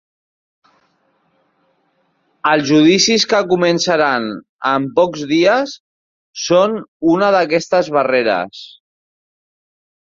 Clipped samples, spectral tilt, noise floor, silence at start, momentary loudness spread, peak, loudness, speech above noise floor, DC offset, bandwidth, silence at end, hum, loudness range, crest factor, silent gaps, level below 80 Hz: under 0.1%; -4 dB/octave; -62 dBFS; 2.45 s; 13 LU; 0 dBFS; -15 LUFS; 48 dB; under 0.1%; 7.6 kHz; 1.4 s; none; 3 LU; 16 dB; 4.49-4.59 s, 5.80-6.34 s, 6.88-7.00 s; -60 dBFS